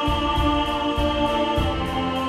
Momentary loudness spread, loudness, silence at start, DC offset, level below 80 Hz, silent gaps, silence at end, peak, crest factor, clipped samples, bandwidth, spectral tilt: 3 LU; -22 LUFS; 0 s; under 0.1%; -30 dBFS; none; 0 s; -10 dBFS; 12 dB; under 0.1%; 15.5 kHz; -6 dB/octave